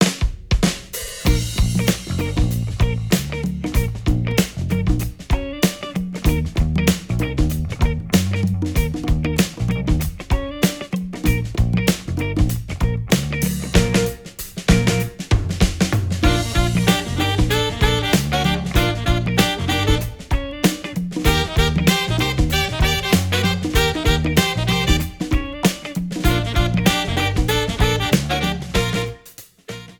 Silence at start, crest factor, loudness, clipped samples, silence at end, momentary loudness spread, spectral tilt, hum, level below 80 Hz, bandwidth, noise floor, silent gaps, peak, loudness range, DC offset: 0 s; 18 dB; -20 LUFS; under 0.1%; 0.05 s; 7 LU; -5 dB/octave; none; -26 dBFS; over 20 kHz; -44 dBFS; none; -2 dBFS; 3 LU; under 0.1%